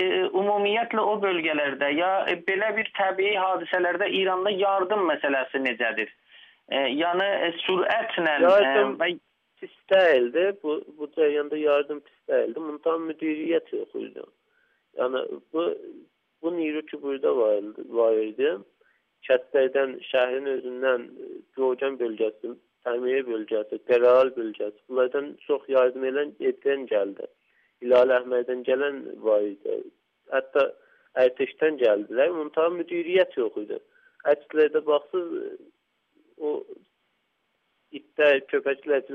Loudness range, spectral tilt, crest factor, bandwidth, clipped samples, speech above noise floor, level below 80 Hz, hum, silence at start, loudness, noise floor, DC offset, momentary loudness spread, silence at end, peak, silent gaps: 6 LU; -6 dB/octave; 18 dB; 5.4 kHz; under 0.1%; 49 dB; -80 dBFS; none; 0 s; -25 LUFS; -74 dBFS; under 0.1%; 13 LU; 0 s; -6 dBFS; none